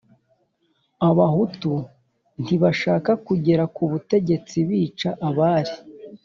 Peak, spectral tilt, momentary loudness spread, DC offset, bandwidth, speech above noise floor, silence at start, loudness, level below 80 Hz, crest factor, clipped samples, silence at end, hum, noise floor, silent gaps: -6 dBFS; -7 dB/octave; 11 LU; under 0.1%; 7.4 kHz; 48 dB; 1 s; -21 LUFS; -58 dBFS; 16 dB; under 0.1%; 0.1 s; none; -68 dBFS; none